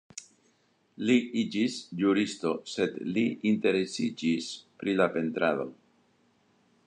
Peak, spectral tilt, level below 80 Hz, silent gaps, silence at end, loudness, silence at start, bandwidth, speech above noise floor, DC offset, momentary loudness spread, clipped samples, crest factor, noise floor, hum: -10 dBFS; -5 dB/octave; -74 dBFS; none; 1.15 s; -29 LUFS; 0.15 s; 10.5 kHz; 41 dB; under 0.1%; 8 LU; under 0.1%; 20 dB; -69 dBFS; none